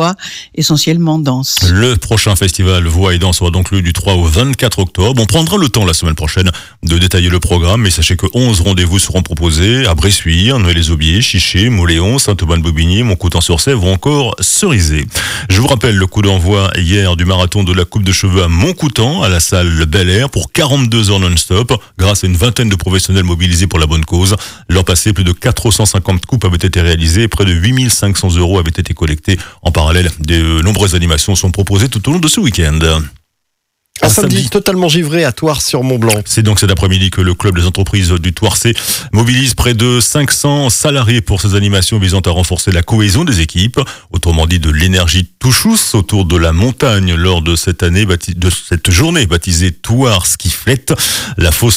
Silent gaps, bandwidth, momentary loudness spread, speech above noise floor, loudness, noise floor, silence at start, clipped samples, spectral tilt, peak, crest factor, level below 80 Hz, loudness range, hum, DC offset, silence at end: none; 16 kHz; 4 LU; 59 dB; -10 LUFS; -69 dBFS; 0 s; under 0.1%; -4.5 dB/octave; 0 dBFS; 10 dB; -24 dBFS; 1 LU; none; under 0.1%; 0 s